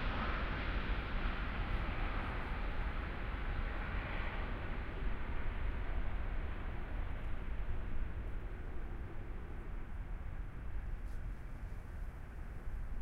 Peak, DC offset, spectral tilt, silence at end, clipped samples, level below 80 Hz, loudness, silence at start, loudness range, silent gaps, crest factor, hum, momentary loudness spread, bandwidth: -24 dBFS; under 0.1%; -7.5 dB/octave; 0 s; under 0.1%; -40 dBFS; -44 LUFS; 0 s; 7 LU; none; 14 dB; none; 9 LU; 5.4 kHz